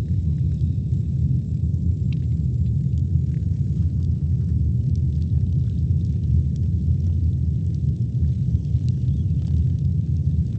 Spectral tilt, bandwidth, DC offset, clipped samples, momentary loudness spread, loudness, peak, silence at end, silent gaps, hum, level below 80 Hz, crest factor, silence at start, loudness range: -10.5 dB/octave; 4 kHz; under 0.1%; under 0.1%; 2 LU; -22 LUFS; -8 dBFS; 0 s; none; none; -28 dBFS; 12 dB; 0 s; 1 LU